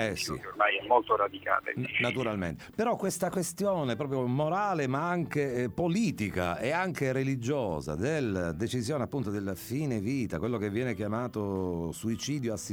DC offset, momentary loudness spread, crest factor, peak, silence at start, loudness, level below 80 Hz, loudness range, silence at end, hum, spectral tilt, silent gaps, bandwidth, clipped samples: under 0.1%; 5 LU; 20 dB; -10 dBFS; 0 s; -31 LUFS; -56 dBFS; 3 LU; 0 s; none; -5.5 dB/octave; none; over 20 kHz; under 0.1%